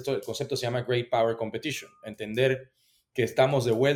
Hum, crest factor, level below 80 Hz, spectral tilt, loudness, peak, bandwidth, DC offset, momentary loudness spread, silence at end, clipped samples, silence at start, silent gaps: none; 18 dB; -64 dBFS; -5.5 dB/octave; -28 LUFS; -8 dBFS; 17.5 kHz; under 0.1%; 12 LU; 0 s; under 0.1%; 0 s; none